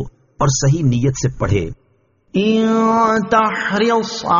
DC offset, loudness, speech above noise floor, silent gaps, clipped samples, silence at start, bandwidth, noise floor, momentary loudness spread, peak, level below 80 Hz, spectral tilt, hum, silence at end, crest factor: under 0.1%; -16 LUFS; 43 dB; none; under 0.1%; 0 s; 7.4 kHz; -58 dBFS; 6 LU; -2 dBFS; -38 dBFS; -5.5 dB/octave; none; 0 s; 14 dB